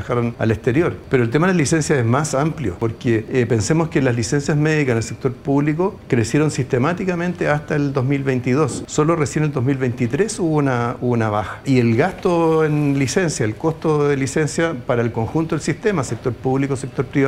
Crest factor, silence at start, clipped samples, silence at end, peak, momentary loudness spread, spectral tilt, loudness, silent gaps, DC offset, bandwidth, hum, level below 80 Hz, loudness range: 16 dB; 0 s; under 0.1%; 0 s; -2 dBFS; 5 LU; -6 dB/octave; -19 LUFS; none; under 0.1%; 13 kHz; none; -46 dBFS; 2 LU